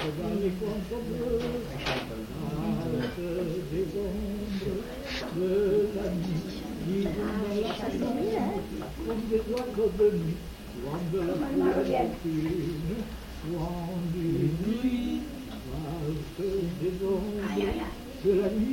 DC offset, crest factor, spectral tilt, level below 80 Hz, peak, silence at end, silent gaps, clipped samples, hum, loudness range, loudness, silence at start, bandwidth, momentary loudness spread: under 0.1%; 16 dB; -7 dB/octave; -44 dBFS; -14 dBFS; 0 s; none; under 0.1%; none; 3 LU; -31 LUFS; 0 s; 17 kHz; 9 LU